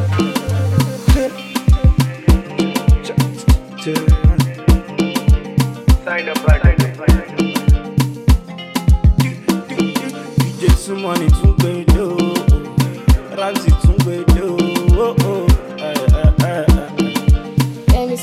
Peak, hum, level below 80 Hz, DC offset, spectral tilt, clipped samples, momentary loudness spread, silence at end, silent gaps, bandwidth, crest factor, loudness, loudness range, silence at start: 0 dBFS; none; -16 dBFS; under 0.1%; -6.5 dB/octave; under 0.1%; 6 LU; 0 s; none; 15 kHz; 14 dB; -16 LUFS; 1 LU; 0 s